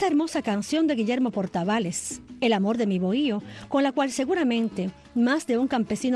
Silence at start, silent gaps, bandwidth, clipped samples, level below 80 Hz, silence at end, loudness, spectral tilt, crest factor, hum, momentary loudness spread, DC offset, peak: 0 s; none; 12.5 kHz; under 0.1%; -60 dBFS; 0 s; -25 LUFS; -5 dB/octave; 12 dB; none; 6 LU; under 0.1%; -12 dBFS